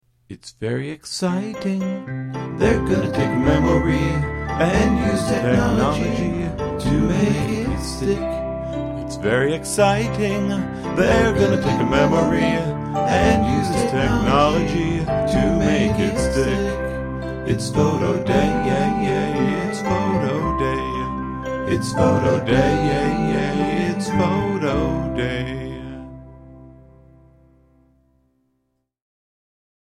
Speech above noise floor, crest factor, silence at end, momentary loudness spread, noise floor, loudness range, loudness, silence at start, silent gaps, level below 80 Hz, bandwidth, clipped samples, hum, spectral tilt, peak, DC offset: 53 dB; 18 dB; 3.25 s; 10 LU; -71 dBFS; 4 LU; -20 LUFS; 0.3 s; none; -34 dBFS; 14 kHz; under 0.1%; none; -6.5 dB/octave; -2 dBFS; under 0.1%